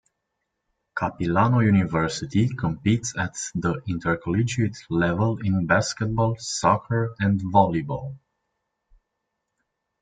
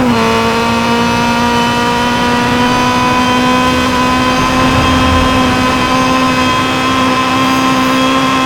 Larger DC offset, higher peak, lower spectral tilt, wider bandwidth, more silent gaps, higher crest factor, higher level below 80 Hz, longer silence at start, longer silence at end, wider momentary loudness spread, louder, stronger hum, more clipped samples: neither; about the same, -2 dBFS vs -2 dBFS; first, -6 dB/octave vs -4.5 dB/octave; second, 9.4 kHz vs over 20 kHz; neither; first, 22 dB vs 8 dB; second, -52 dBFS vs -28 dBFS; first, 0.95 s vs 0 s; first, 1.85 s vs 0 s; first, 8 LU vs 2 LU; second, -23 LUFS vs -10 LUFS; neither; neither